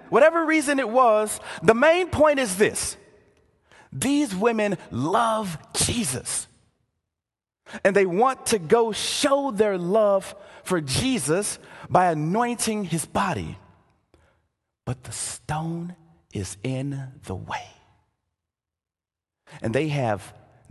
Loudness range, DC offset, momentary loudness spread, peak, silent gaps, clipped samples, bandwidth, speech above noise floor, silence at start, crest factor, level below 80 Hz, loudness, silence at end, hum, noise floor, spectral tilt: 12 LU; under 0.1%; 15 LU; -2 dBFS; none; under 0.1%; 13 kHz; 67 dB; 0.05 s; 24 dB; -52 dBFS; -23 LUFS; 0.4 s; none; -90 dBFS; -4 dB/octave